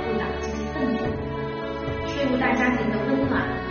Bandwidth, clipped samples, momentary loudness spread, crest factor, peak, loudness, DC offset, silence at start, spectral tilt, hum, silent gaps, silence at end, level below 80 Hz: 6.6 kHz; under 0.1%; 8 LU; 16 dB; -10 dBFS; -25 LUFS; under 0.1%; 0 s; -5 dB/octave; none; none; 0 s; -40 dBFS